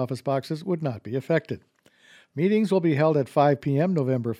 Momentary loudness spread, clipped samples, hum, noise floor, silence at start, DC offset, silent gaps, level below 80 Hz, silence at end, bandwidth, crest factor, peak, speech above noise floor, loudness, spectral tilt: 9 LU; under 0.1%; none; -56 dBFS; 0 s; under 0.1%; none; -68 dBFS; 0.05 s; 13 kHz; 18 dB; -8 dBFS; 32 dB; -24 LUFS; -8 dB/octave